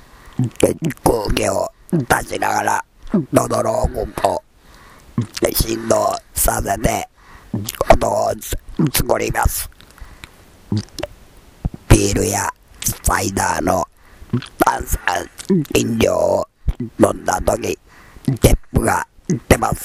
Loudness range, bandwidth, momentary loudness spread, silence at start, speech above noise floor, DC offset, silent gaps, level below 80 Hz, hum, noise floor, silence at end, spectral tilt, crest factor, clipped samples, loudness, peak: 2 LU; 16.5 kHz; 11 LU; 0.25 s; 27 dB; under 0.1%; none; -28 dBFS; none; -45 dBFS; 0 s; -4.5 dB/octave; 18 dB; under 0.1%; -19 LUFS; 0 dBFS